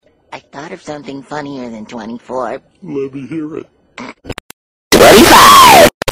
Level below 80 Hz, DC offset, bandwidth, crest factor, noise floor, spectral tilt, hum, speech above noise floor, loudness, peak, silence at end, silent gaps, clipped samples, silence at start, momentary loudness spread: -34 dBFS; under 0.1%; over 20 kHz; 10 dB; -35 dBFS; -2.5 dB/octave; none; 11 dB; -3 LUFS; 0 dBFS; 0 s; 4.40-4.91 s, 5.94-6.01 s; 2%; 0.35 s; 27 LU